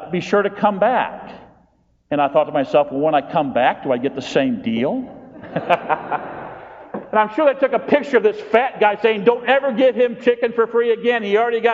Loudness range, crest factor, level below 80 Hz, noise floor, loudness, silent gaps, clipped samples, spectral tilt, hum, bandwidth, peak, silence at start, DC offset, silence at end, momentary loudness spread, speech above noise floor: 5 LU; 18 dB; -60 dBFS; -58 dBFS; -18 LUFS; none; under 0.1%; -3.5 dB/octave; none; 7.6 kHz; 0 dBFS; 0 s; under 0.1%; 0 s; 12 LU; 41 dB